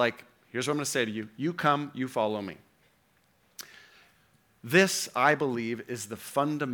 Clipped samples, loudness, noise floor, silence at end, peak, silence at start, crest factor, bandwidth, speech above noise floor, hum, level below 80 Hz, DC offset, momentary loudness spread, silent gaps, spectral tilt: under 0.1%; -28 LUFS; -67 dBFS; 0 s; -8 dBFS; 0 s; 22 dB; over 20 kHz; 39 dB; none; -76 dBFS; under 0.1%; 21 LU; none; -4 dB/octave